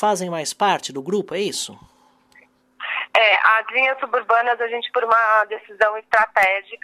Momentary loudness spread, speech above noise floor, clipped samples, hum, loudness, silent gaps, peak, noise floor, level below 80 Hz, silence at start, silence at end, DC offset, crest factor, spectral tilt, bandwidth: 11 LU; 35 dB; under 0.1%; none; -19 LUFS; none; -2 dBFS; -55 dBFS; -66 dBFS; 0 s; 0.1 s; under 0.1%; 18 dB; -2.5 dB/octave; 15.5 kHz